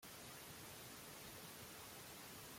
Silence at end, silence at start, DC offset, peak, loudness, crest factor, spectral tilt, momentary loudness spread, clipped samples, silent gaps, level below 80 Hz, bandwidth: 0 s; 0 s; under 0.1%; -42 dBFS; -54 LUFS; 14 dB; -2.5 dB/octave; 0 LU; under 0.1%; none; -76 dBFS; 16.5 kHz